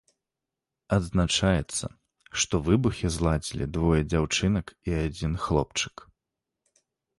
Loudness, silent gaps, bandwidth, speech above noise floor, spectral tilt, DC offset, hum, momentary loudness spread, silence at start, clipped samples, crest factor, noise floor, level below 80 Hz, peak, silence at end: -27 LUFS; none; 11.5 kHz; 62 dB; -5 dB/octave; under 0.1%; none; 8 LU; 0.9 s; under 0.1%; 18 dB; -88 dBFS; -38 dBFS; -8 dBFS; 1.15 s